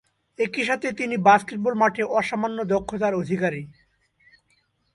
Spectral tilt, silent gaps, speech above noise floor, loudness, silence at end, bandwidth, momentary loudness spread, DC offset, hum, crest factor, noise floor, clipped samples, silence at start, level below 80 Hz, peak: -5.5 dB/octave; none; 45 dB; -23 LUFS; 1.25 s; 11.5 kHz; 9 LU; under 0.1%; none; 22 dB; -67 dBFS; under 0.1%; 0.4 s; -58 dBFS; -2 dBFS